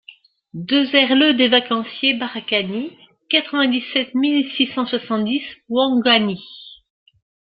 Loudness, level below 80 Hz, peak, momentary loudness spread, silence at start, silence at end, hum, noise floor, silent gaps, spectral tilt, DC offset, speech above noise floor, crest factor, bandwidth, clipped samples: -18 LUFS; -64 dBFS; -2 dBFS; 13 LU; 0.55 s; 0.75 s; none; -47 dBFS; none; -8.5 dB/octave; under 0.1%; 29 dB; 18 dB; 5.2 kHz; under 0.1%